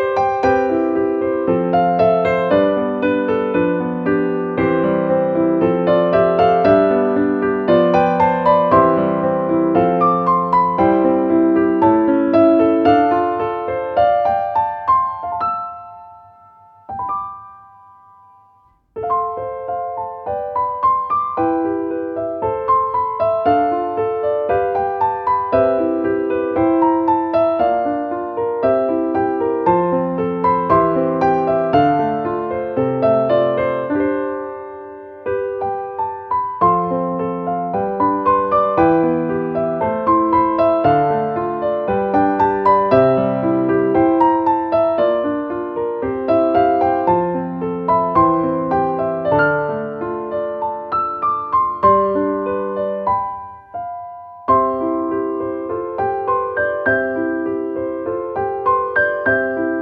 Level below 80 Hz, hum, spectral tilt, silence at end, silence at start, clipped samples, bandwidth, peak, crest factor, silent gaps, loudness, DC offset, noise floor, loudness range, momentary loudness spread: -48 dBFS; none; -9 dB/octave; 0 s; 0 s; under 0.1%; 5.8 kHz; 0 dBFS; 16 dB; none; -17 LUFS; under 0.1%; -54 dBFS; 6 LU; 9 LU